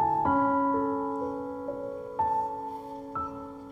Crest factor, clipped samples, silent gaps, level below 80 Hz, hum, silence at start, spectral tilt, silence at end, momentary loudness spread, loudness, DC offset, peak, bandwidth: 14 dB; under 0.1%; none; -60 dBFS; none; 0 s; -8.5 dB/octave; 0 s; 12 LU; -30 LUFS; under 0.1%; -14 dBFS; 7.8 kHz